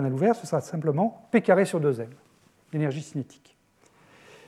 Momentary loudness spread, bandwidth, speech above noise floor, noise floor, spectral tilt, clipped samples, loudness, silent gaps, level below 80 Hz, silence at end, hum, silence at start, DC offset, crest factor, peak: 14 LU; 13.5 kHz; 35 dB; -61 dBFS; -7 dB/octave; under 0.1%; -26 LUFS; none; -78 dBFS; 1.25 s; none; 0 s; under 0.1%; 20 dB; -6 dBFS